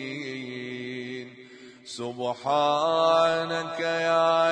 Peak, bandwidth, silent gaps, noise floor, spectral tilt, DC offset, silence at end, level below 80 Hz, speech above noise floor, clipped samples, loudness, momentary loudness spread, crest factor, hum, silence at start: -10 dBFS; 10 kHz; none; -48 dBFS; -4.5 dB/octave; under 0.1%; 0 s; -76 dBFS; 24 dB; under 0.1%; -26 LUFS; 16 LU; 16 dB; none; 0 s